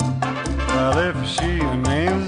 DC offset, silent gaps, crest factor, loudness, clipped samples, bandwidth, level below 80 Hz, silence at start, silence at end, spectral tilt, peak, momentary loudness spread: under 0.1%; none; 14 dB; -21 LUFS; under 0.1%; 10 kHz; -30 dBFS; 0 s; 0 s; -5.5 dB/octave; -6 dBFS; 5 LU